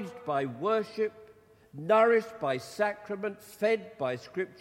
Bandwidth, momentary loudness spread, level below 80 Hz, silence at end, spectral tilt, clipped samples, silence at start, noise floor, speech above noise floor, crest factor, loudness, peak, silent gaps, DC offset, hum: 16.5 kHz; 12 LU; -74 dBFS; 0.1 s; -5.5 dB/octave; under 0.1%; 0 s; -56 dBFS; 27 dB; 20 dB; -30 LUFS; -12 dBFS; none; under 0.1%; none